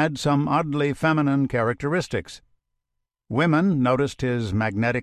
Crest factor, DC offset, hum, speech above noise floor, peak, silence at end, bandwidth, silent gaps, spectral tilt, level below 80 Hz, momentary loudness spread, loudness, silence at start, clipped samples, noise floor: 16 dB; under 0.1%; none; 58 dB; -6 dBFS; 0 s; 12.5 kHz; none; -7 dB/octave; -48 dBFS; 6 LU; -23 LUFS; 0 s; under 0.1%; -80 dBFS